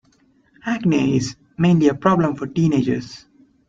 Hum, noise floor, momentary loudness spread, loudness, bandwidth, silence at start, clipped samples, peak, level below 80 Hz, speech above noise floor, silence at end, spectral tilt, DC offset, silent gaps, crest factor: none; -58 dBFS; 12 LU; -19 LUFS; 7.6 kHz; 0.65 s; under 0.1%; -2 dBFS; -52 dBFS; 40 dB; 0.5 s; -7 dB/octave; under 0.1%; none; 18 dB